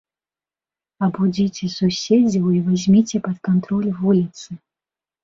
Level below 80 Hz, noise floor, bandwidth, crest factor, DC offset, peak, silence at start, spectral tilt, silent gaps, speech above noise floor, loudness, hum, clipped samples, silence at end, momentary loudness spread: -56 dBFS; under -90 dBFS; 7.6 kHz; 16 dB; under 0.1%; -4 dBFS; 1 s; -7 dB/octave; none; over 72 dB; -19 LUFS; none; under 0.1%; 0.65 s; 9 LU